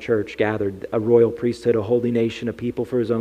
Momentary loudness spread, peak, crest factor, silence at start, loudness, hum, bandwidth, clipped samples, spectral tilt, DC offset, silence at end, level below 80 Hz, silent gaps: 9 LU; -4 dBFS; 16 dB; 0 s; -21 LUFS; none; 9.6 kHz; under 0.1%; -7.5 dB/octave; under 0.1%; 0 s; -54 dBFS; none